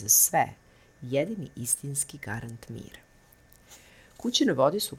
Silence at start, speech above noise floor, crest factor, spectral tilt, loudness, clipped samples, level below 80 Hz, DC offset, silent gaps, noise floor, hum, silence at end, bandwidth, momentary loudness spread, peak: 0 s; 30 dB; 22 dB; -2.5 dB/octave; -26 LUFS; under 0.1%; -62 dBFS; under 0.1%; none; -58 dBFS; none; 0 s; 18 kHz; 21 LU; -8 dBFS